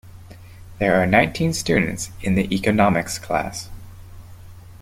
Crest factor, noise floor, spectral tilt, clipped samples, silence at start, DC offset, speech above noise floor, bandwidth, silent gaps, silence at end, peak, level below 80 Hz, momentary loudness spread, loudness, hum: 20 dB; -41 dBFS; -5 dB/octave; under 0.1%; 0.05 s; under 0.1%; 21 dB; 16 kHz; none; 0.05 s; -2 dBFS; -42 dBFS; 10 LU; -20 LUFS; none